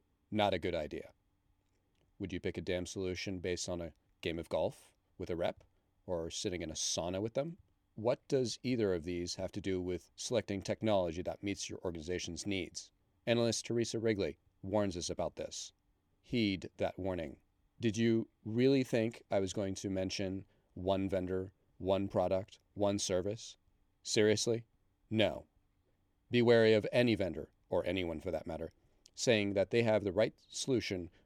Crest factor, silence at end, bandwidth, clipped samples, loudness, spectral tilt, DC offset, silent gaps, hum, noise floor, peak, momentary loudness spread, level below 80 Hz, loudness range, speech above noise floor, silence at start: 22 dB; 0.15 s; 14.5 kHz; under 0.1%; -36 LUFS; -5 dB/octave; under 0.1%; none; none; -76 dBFS; -14 dBFS; 12 LU; -64 dBFS; 7 LU; 41 dB; 0.3 s